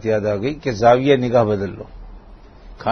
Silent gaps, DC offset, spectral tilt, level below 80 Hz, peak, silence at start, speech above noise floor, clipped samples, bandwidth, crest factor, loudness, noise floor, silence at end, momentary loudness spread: none; under 0.1%; -7 dB/octave; -42 dBFS; -2 dBFS; 0 s; 24 dB; under 0.1%; 6.6 kHz; 18 dB; -18 LUFS; -41 dBFS; 0 s; 15 LU